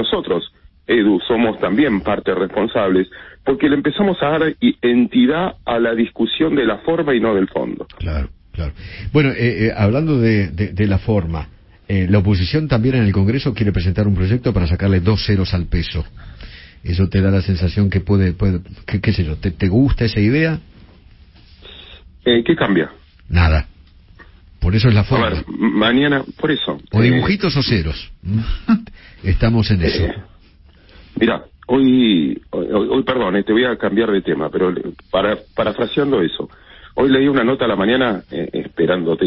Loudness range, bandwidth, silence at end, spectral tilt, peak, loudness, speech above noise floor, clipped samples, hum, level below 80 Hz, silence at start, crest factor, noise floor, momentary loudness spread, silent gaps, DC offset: 3 LU; 5.8 kHz; 0 s; -10.5 dB/octave; -2 dBFS; -17 LUFS; 31 dB; under 0.1%; none; -30 dBFS; 0 s; 16 dB; -47 dBFS; 11 LU; none; under 0.1%